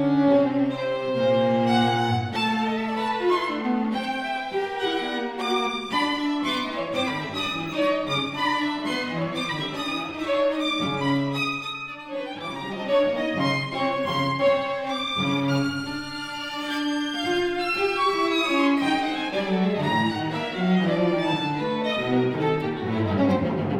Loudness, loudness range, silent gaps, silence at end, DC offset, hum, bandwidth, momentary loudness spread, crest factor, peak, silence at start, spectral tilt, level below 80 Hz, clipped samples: -24 LUFS; 3 LU; none; 0 s; under 0.1%; none; 15.5 kHz; 7 LU; 14 dB; -10 dBFS; 0 s; -5.5 dB/octave; -58 dBFS; under 0.1%